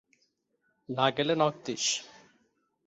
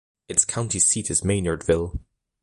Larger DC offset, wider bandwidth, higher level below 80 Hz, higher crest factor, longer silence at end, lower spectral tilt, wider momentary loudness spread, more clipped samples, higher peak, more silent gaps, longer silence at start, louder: neither; second, 8.2 kHz vs 11.5 kHz; second, -74 dBFS vs -40 dBFS; about the same, 22 dB vs 22 dB; first, 0.8 s vs 0.45 s; about the same, -3 dB/octave vs -3.5 dB/octave; about the same, 7 LU vs 6 LU; neither; second, -10 dBFS vs -2 dBFS; neither; first, 0.9 s vs 0.3 s; second, -29 LUFS vs -21 LUFS